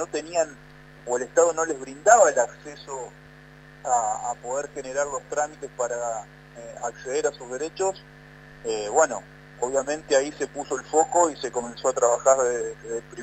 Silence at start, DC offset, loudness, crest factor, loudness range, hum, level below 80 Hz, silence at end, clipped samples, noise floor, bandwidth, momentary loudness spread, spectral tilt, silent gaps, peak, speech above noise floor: 0 s; under 0.1%; -24 LUFS; 22 dB; 7 LU; none; -58 dBFS; 0 s; under 0.1%; -48 dBFS; 9.2 kHz; 16 LU; -2.5 dB/octave; none; -2 dBFS; 23 dB